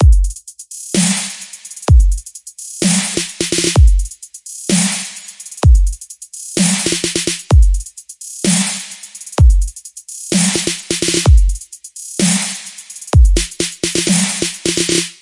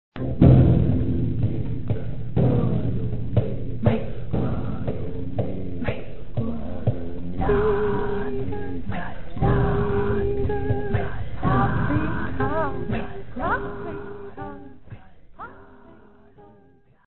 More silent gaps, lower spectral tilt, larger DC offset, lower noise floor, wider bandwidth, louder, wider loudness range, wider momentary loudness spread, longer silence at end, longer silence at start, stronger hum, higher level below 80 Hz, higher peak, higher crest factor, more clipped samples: neither; second, -4 dB/octave vs -13 dB/octave; second, under 0.1% vs 5%; second, -33 dBFS vs -56 dBFS; first, 11.5 kHz vs 4.2 kHz; first, -15 LUFS vs -24 LUFS; second, 1 LU vs 7 LU; first, 17 LU vs 14 LU; about the same, 0.1 s vs 0 s; about the same, 0 s vs 0.1 s; neither; first, -16 dBFS vs -34 dBFS; about the same, 0 dBFS vs -2 dBFS; second, 14 dB vs 22 dB; neither